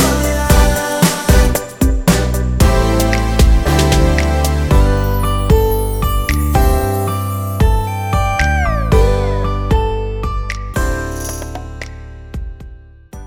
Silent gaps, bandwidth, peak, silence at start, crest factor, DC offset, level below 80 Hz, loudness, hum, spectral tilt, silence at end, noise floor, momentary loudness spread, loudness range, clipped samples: none; 19.5 kHz; 0 dBFS; 0 s; 14 dB; under 0.1%; -16 dBFS; -15 LUFS; none; -5.5 dB/octave; 0 s; -35 dBFS; 11 LU; 7 LU; under 0.1%